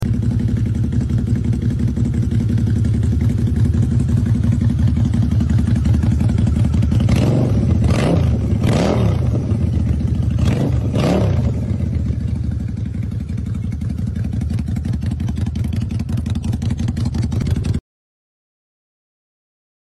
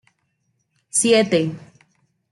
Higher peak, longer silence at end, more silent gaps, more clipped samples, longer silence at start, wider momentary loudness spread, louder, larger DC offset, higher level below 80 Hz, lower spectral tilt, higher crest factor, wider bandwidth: about the same, -6 dBFS vs -4 dBFS; first, 2.1 s vs 0.75 s; neither; neither; second, 0 s vs 0.95 s; second, 6 LU vs 13 LU; about the same, -18 LUFS vs -18 LUFS; neither; first, -24 dBFS vs -66 dBFS; first, -8 dB/octave vs -3.5 dB/octave; second, 12 dB vs 18 dB; about the same, 12 kHz vs 12 kHz